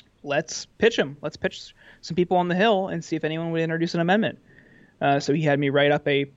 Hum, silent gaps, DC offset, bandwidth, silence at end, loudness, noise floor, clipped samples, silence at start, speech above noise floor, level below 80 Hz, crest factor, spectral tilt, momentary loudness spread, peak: none; none; under 0.1%; 8 kHz; 0.1 s; -24 LUFS; -53 dBFS; under 0.1%; 0.25 s; 30 dB; -60 dBFS; 16 dB; -5.5 dB/octave; 10 LU; -8 dBFS